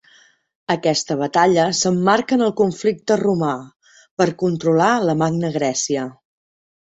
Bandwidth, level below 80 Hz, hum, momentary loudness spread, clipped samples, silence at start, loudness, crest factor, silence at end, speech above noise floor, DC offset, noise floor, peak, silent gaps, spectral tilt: 8.2 kHz; -58 dBFS; none; 8 LU; under 0.1%; 0.7 s; -18 LUFS; 18 dB; 0.7 s; 36 dB; under 0.1%; -53 dBFS; -2 dBFS; 3.76-3.80 s, 4.11-4.17 s; -4.5 dB/octave